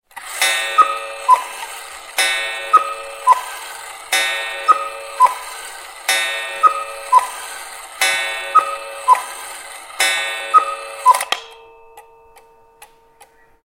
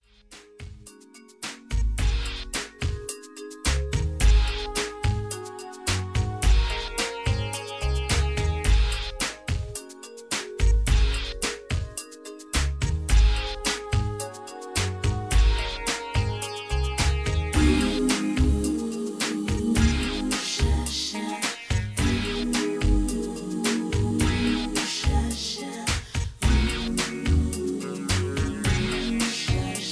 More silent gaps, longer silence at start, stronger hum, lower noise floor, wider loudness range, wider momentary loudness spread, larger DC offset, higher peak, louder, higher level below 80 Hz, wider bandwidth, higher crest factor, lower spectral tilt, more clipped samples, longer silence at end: neither; second, 0.15 s vs 0.3 s; neither; about the same, -49 dBFS vs -51 dBFS; about the same, 2 LU vs 3 LU; first, 15 LU vs 9 LU; neither; first, 0 dBFS vs -8 dBFS; first, -16 LUFS vs -26 LUFS; second, -60 dBFS vs -28 dBFS; first, 17 kHz vs 11 kHz; about the same, 18 dB vs 16 dB; second, 2.5 dB/octave vs -4.5 dB/octave; neither; first, 0.8 s vs 0 s